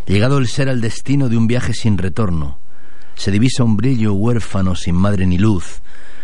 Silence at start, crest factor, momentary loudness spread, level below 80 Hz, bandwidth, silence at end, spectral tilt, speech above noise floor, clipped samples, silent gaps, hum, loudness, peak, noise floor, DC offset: 0.05 s; 16 dB; 6 LU; -34 dBFS; 11.5 kHz; 0.25 s; -6.5 dB/octave; 32 dB; under 0.1%; none; none; -17 LUFS; -2 dBFS; -48 dBFS; 20%